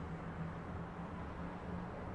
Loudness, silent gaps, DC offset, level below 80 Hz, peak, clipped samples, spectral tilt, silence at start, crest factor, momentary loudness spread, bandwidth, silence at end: -46 LUFS; none; under 0.1%; -56 dBFS; -32 dBFS; under 0.1%; -8 dB/octave; 0 s; 12 dB; 1 LU; 10.5 kHz; 0 s